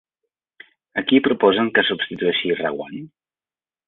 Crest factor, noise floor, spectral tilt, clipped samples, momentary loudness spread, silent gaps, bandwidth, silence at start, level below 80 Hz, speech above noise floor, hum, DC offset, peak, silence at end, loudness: 20 dB; under -90 dBFS; -8.5 dB/octave; under 0.1%; 14 LU; none; 4.2 kHz; 0.95 s; -64 dBFS; over 71 dB; none; under 0.1%; -2 dBFS; 0.8 s; -19 LUFS